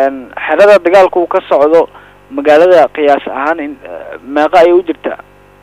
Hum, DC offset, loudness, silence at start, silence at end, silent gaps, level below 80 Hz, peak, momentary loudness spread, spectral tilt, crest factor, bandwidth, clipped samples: none; under 0.1%; -9 LUFS; 0 s; 0.45 s; none; -48 dBFS; 0 dBFS; 17 LU; -5 dB/octave; 10 dB; 11.5 kHz; 0.1%